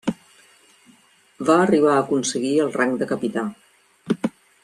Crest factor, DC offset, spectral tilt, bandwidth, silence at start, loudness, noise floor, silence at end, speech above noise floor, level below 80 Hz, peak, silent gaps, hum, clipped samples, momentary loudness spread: 18 dB; under 0.1%; -5 dB/octave; 13 kHz; 0.05 s; -21 LUFS; -56 dBFS; 0.35 s; 36 dB; -66 dBFS; -4 dBFS; none; none; under 0.1%; 13 LU